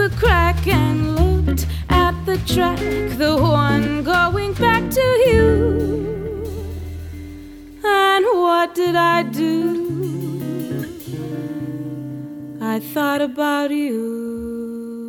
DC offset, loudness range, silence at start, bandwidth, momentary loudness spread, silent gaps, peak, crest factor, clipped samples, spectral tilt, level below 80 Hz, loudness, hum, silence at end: under 0.1%; 8 LU; 0 s; 19 kHz; 14 LU; none; -2 dBFS; 16 dB; under 0.1%; -6 dB/octave; -28 dBFS; -18 LUFS; none; 0 s